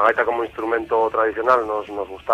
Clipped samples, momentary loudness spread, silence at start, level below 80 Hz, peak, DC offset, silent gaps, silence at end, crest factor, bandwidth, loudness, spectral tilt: under 0.1%; 9 LU; 0 s; -52 dBFS; -4 dBFS; under 0.1%; none; 0 s; 16 dB; 9.4 kHz; -21 LUFS; -5.5 dB/octave